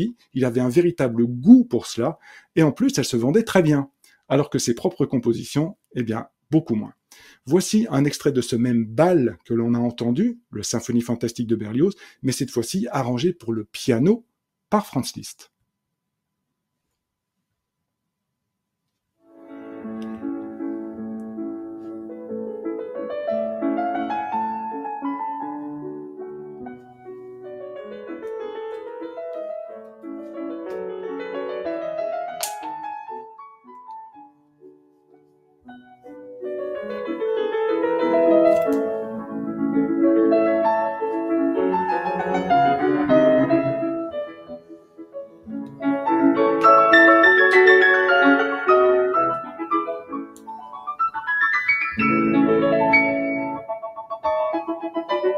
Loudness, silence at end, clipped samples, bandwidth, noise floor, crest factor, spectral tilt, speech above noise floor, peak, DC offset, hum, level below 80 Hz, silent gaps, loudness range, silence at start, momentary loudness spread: -21 LUFS; 0 s; under 0.1%; 15.5 kHz; -80 dBFS; 22 dB; -5.5 dB/octave; 59 dB; 0 dBFS; under 0.1%; none; -60 dBFS; none; 18 LU; 0 s; 19 LU